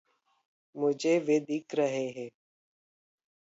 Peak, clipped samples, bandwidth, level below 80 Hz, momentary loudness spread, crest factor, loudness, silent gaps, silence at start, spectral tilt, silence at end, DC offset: -16 dBFS; under 0.1%; 8 kHz; -86 dBFS; 17 LU; 16 dB; -30 LUFS; none; 0.75 s; -5.5 dB/octave; 1.15 s; under 0.1%